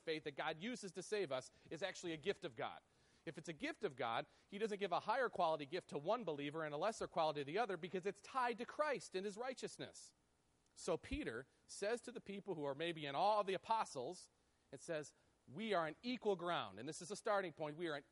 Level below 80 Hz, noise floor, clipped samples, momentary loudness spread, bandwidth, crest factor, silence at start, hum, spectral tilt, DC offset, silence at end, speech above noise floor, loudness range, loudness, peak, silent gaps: -72 dBFS; -79 dBFS; under 0.1%; 11 LU; 11.5 kHz; 18 dB; 0.05 s; none; -4 dB/octave; under 0.1%; 0.1 s; 35 dB; 5 LU; -44 LUFS; -26 dBFS; none